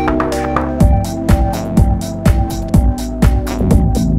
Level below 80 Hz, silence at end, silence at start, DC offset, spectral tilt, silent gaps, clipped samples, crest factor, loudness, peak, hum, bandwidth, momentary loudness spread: -16 dBFS; 0 s; 0 s; under 0.1%; -7 dB/octave; none; 0.2%; 12 dB; -15 LUFS; 0 dBFS; none; 15.5 kHz; 4 LU